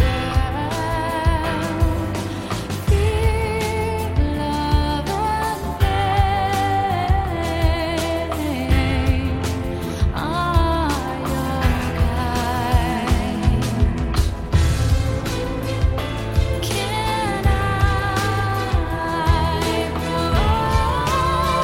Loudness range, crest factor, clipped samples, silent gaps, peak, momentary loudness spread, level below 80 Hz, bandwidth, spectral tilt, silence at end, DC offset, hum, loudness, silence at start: 1 LU; 16 dB; under 0.1%; none; -4 dBFS; 5 LU; -24 dBFS; 16.5 kHz; -6 dB/octave; 0 s; under 0.1%; none; -21 LUFS; 0 s